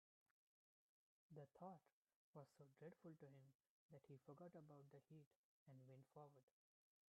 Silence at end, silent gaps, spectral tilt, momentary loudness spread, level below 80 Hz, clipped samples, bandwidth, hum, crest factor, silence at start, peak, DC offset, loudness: 0.6 s; 1.92-2.05 s, 2.14-2.33 s, 3.55-3.59 s, 3.70-3.89 s, 5.26-5.66 s, 6.43-6.48 s; -7 dB/octave; 6 LU; under -90 dBFS; under 0.1%; 3.8 kHz; none; 20 dB; 1.3 s; -48 dBFS; under 0.1%; -66 LUFS